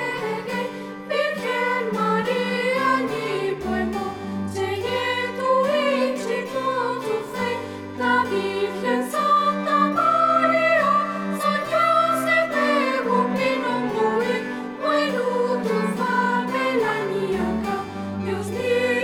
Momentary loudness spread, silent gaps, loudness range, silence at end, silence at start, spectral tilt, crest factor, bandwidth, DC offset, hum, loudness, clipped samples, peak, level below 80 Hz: 8 LU; none; 4 LU; 0 s; 0 s; -5 dB/octave; 16 dB; 18 kHz; under 0.1%; none; -22 LUFS; under 0.1%; -8 dBFS; -54 dBFS